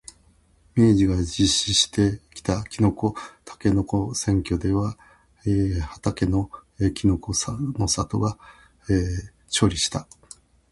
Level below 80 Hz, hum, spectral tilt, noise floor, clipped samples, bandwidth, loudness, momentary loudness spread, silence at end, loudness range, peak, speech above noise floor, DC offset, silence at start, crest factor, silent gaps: -38 dBFS; none; -5 dB/octave; -58 dBFS; under 0.1%; 11.5 kHz; -23 LUFS; 13 LU; 0.7 s; 4 LU; -6 dBFS; 36 dB; under 0.1%; 0.75 s; 18 dB; none